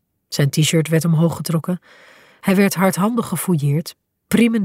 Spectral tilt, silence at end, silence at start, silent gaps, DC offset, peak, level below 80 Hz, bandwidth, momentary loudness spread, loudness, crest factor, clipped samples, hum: -5.5 dB/octave; 0 s; 0.3 s; none; under 0.1%; -4 dBFS; -58 dBFS; 16 kHz; 9 LU; -18 LUFS; 16 dB; under 0.1%; none